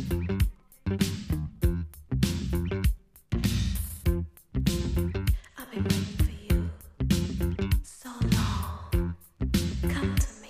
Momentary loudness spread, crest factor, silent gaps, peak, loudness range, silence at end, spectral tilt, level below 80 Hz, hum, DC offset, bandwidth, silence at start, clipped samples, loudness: 7 LU; 18 dB; none; -10 dBFS; 1 LU; 0 s; -6 dB/octave; -32 dBFS; none; under 0.1%; 15.5 kHz; 0 s; under 0.1%; -30 LUFS